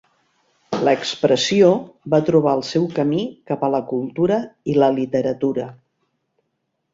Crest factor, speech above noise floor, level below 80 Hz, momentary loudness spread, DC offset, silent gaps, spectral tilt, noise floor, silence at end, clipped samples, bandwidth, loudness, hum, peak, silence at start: 18 dB; 55 dB; -60 dBFS; 9 LU; under 0.1%; none; -6 dB/octave; -74 dBFS; 1.2 s; under 0.1%; 7.8 kHz; -19 LUFS; none; -2 dBFS; 0.7 s